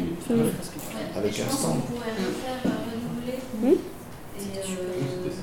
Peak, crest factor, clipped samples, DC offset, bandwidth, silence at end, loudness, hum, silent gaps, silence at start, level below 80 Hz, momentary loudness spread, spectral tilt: -8 dBFS; 20 dB; under 0.1%; under 0.1%; 19 kHz; 0 s; -28 LUFS; none; none; 0 s; -52 dBFS; 11 LU; -5.5 dB/octave